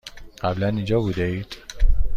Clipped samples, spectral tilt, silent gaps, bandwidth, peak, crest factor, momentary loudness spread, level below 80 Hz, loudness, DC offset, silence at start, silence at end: under 0.1%; -7 dB/octave; none; 7.4 kHz; -4 dBFS; 16 dB; 10 LU; -24 dBFS; -25 LUFS; under 0.1%; 0.05 s; 0 s